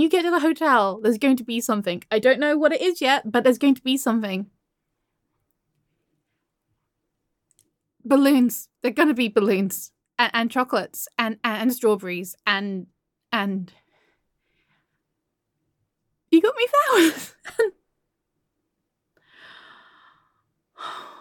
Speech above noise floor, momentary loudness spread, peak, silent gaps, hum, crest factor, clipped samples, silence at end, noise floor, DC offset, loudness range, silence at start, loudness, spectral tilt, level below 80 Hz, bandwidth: 58 dB; 14 LU; -4 dBFS; none; none; 20 dB; under 0.1%; 0.1 s; -79 dBFS; under 0.1%; 13 LU; 0 s; -21 LUFS; -4 dB/octave; -74 dBFS; 17.5 kHz